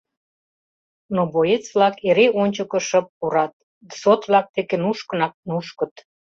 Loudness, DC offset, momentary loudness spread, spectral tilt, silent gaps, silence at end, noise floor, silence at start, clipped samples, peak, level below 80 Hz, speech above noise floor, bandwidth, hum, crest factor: -20 LUFS; under 0.1%; 11 LU; -5 dB/octave; 3.09-3.21 s, 3.53-3.81 s, 4.49-4.54 s, 5.34-5.43 s; 0.3 s; under -90 dBFS; 1.1 s; under 0.1%; -2 dBFS; -64 dBFS; over 70 dB; 7.8 kHz; none; 18 dB